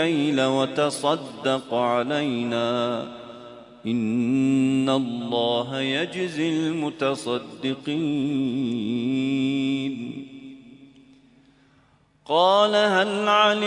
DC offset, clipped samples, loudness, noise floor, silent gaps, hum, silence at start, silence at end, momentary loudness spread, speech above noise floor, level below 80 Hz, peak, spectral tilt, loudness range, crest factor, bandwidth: under 0.1%; under 0.1%; -23 LUFS; -60 dBFS; none; none; 0 s; 0 s; 13 LU; 37 dB; -68 dBFS; -6 dBFS; -5 dB/octave; 4 LU; 18 dB; 11 kHz